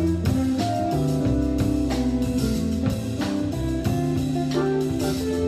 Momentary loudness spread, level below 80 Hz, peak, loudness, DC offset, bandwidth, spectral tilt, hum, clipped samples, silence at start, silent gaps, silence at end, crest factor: 3 LU; -36 dBFS; -10 dBFS; -24 LUFS; under 0.1%; 14 kHz; -7 dB/octave; none; under 0.1%; 0 s; none; 0 s; 12 dB